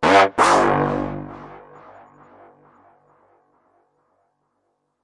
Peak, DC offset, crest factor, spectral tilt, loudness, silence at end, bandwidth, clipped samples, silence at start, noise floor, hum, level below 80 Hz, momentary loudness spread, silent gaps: -2 dBFS; under 0.1%; 20 dB; -4.5 dB/octave; -17 LUFS; 3.45 s; 11.5 kHz; under 0.1%; 0 s; -72 dBFS; none; -50 dBFS; 24 LU; none